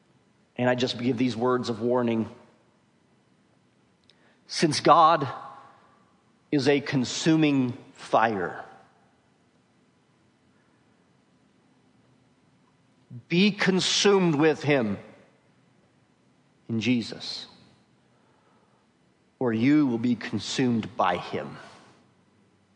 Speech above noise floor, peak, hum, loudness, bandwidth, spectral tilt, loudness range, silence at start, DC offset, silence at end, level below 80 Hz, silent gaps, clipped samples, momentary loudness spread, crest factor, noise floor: 41 dB; -2 dBFS; none; -25 LUFS; 10.5 kHz; -5 dB/octave; 9 LU; 0.6 s; under 0.1%; 1.05 s; -74 dBFS; none; under 0.1%; 17 LU; 24 dB; -65 dBFS